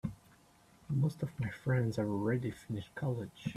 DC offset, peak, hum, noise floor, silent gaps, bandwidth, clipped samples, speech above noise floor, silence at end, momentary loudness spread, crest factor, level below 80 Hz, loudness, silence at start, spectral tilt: under 0.1%; -20 dBFS; none; -64 dBFS; none; 13 kHz; under 0.1%; 29 dB; 0 s; 8 LU; 16 dB; -62 dBFS; -36 LUFS; 0.05 s; -8 dB/octave